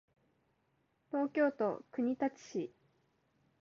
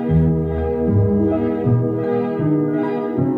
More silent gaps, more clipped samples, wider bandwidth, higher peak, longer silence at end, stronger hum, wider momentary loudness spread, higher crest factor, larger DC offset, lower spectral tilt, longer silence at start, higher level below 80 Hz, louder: neither; neither; first, 7.2 kHz vs 4.3 kHz; second, -22 dBFS vs -6 dBFS; first, 0.95 s vs 0 s; neither; first, 10 LU vs 4 LU; about the same, 16 dB vs 12 dB; neither; second, -5.5 dB/octave vs -12 dB/octave; first, 1.15 s vs 0 s; second, -84 dBFS vs -34 dBFS; second, -36 LUFS vs -19 LUFS